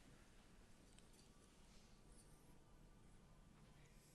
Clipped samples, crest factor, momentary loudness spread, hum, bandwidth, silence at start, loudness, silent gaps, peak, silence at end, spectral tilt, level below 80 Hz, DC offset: under 0.1%; 20 dB; 2 LU; none; 12 kHz; 0 s; -69 LUFS; none; -48 dBFS; 0 s; -4 dB/octave; -70 dBFS; under 0.1%